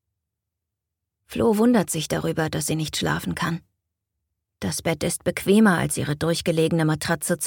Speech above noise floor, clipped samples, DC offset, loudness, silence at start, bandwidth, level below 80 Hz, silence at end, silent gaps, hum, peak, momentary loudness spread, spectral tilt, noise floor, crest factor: 61 dB; under 0.1%; under 0.1%; -23 LUFS; 1.3 s; 18.5 kHz; -50 dBFS; 0 s; none; none; -6 dBFS; 9 LU; -5 dB/octave; -83 dBFS; 18 dB